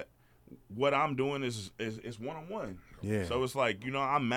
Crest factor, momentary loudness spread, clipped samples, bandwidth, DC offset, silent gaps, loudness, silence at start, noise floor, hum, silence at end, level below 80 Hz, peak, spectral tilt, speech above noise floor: 18 dB; 12 LU; under 0.1%; 18 kHz; under 0.1%; none; -34 LUFS; 0 s; -59 dBFS; none; 0 s; -60 dBFS; -16 dBFS; -5.5 dB/octave; 25 dB